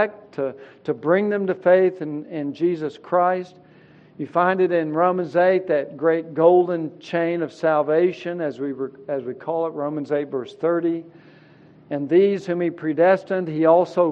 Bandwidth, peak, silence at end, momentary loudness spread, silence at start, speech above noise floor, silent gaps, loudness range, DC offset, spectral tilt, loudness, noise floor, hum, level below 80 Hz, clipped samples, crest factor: 7.2 kHz; -4 dBFS; 0 s; 12 LU; 0 s; 29 dB; none; 5 LU; under 0.1%; -8 dB/octave; -21 LUFS; -50 dBFS; none; -74 dBFS; under 0.1%; 18 dB